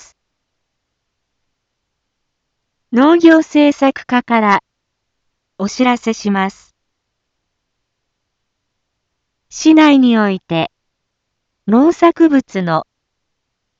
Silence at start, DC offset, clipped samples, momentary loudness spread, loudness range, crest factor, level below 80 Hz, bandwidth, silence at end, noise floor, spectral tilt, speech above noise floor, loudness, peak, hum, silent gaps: 2.9 s; under 0.1%; under 0.1%; 11 LU; 8 LU; 16 dB; -60 dBFS; 7.8 kHz; 0.95 s; -73 dBFS; -5.5 dB/octave; 62 dB; -12 LUFS; 0 dBFS; none; none